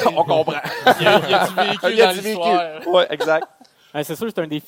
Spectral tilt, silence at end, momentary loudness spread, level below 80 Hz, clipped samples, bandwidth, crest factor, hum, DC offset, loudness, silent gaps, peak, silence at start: -4 dB/octave; 0.05 s; 10 LU; -66 dBFS; under 0.1%; 17 kHz; 18 dB; none; under 0.1%; -18 LUFS; none; 0 dBFS; 0 s